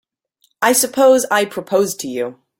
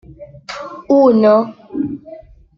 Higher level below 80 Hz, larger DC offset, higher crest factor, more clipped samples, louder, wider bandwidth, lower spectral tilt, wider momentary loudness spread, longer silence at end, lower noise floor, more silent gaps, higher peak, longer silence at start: second, -64 dBFS vs -50 dBFS; neither; about the same, 16 dB vs 14 dB; neither; about the same, -16 LUFS vs -14 LUFS; first, 17 kHz vs 7.6 kHz; second, -2.5 dB/octave vs -7.5 dB/octave; second, 11 LU vs 21 LU; second, 0.25 s vs 0.4 s; first, -63 dBFS vs -38 dBFS; neither; about the same, -2 dBFS vs -2 dBFS; first, 0.6 s vs 0.2 s